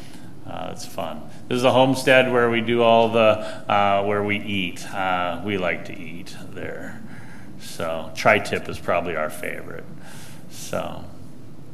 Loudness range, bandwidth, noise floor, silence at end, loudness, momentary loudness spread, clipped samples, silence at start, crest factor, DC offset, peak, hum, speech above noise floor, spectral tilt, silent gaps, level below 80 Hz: 10 LU; 15.5 kHz; -42 dBFS; 0 s; -21 LUFS; 23 LU; under 0.1%; 0 s; 22 dB; 2%; 0 dBFS; none; 20 dB; -5 dB/octave; none; -52 dBFS